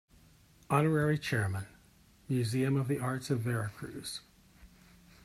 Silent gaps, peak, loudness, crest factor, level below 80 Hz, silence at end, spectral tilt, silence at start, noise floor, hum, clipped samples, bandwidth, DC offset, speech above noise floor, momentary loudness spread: none; -12 dBFS; -33 LUFS; 22 dB; -64 dBFS; 0.6 s; -6.5 dB/octave; 0.7 s; -62 dBFS; none; under 0.1%; 14.5 kHz; under 0.1%; 31 dB; 13 LU